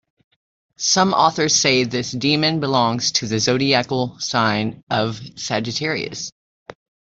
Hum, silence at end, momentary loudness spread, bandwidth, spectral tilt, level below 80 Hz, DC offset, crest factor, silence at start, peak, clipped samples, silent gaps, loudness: none; 0.35 s; 9 LU; 8 kHz; -3.5 dB/octave; -58 dBFS; under 0.1%; 18 dB; 0.8 s; -2 dBFS; under 0.1%; 4.83-4.87 s, 6.32-6.66 s; -19 LUFS